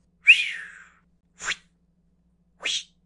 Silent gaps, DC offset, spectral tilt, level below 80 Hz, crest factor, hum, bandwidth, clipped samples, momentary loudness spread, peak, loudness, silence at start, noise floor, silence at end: none; under 0.1%; 2.5 dB/octave; -66 dBFS; 24 dB; none; 11.5 kHz; under 0.1%; 20 LU; -4 dBFS; -21 LUFS; 0.25 s; -65 dBFS; 0.25 s